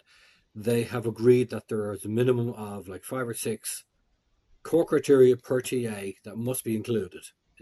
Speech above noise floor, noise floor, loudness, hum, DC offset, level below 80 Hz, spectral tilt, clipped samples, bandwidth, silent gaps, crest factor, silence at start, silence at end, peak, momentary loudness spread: 44 dB; -70 dBFS; -26 LUFS; none; under 0.1%; -68 dBFS; -6 dB/octave; under 0.1%; 12.5 kHz; none; 18 dB; 0.55 s; 0.35 s; -8 dBFS; 16 LU